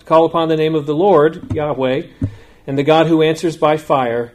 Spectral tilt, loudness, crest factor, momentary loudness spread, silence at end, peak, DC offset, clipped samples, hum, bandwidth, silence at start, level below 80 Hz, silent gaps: -7 dB/octave; -15 LUFS; 14 dB; 11 LU; 0.05 s; 0 dBFS; under 0.1%; under 0.1%; none; 13.5 kHz; 0.05 s; -46 dBFS; none